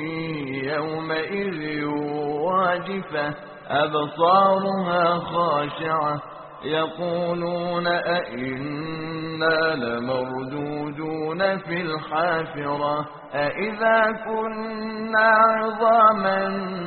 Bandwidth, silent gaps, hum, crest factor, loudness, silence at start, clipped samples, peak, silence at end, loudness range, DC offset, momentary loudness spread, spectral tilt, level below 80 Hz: 4.6 kHz; none; none; 18 dB; -23 LUFS; 0 s; under 0.1%; -4 dBFS; 0 s; 6 LU; under 0.1%; 12 LU; -3.5 dB/octave; -60 dBFS